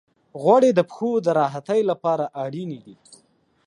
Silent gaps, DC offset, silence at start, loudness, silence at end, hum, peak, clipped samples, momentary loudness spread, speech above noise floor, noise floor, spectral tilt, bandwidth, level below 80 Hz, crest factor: none; under 0.1%; 0.35 s; -21 LUFS; 0.75 s; none; -4 dBFS; under 0.1%; 17 LU; 40 dB; -61 dBFS; -7 dB/octave; 11 kHz; -74 dBFS; 18 dB